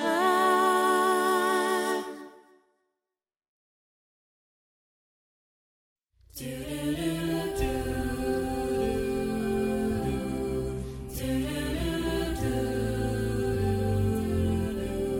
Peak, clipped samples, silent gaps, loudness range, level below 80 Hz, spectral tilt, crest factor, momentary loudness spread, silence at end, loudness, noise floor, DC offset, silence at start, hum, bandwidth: -12 dBFS; under 0.1%; 3.48-5.96 s; 10 LU; -42 dBFS; -5.5 dB/octave; 16 dB; 10 LU; 0 s; -28 LUFS; under -90 dBFS; under 0.1%; 0 s; none; 17 kHz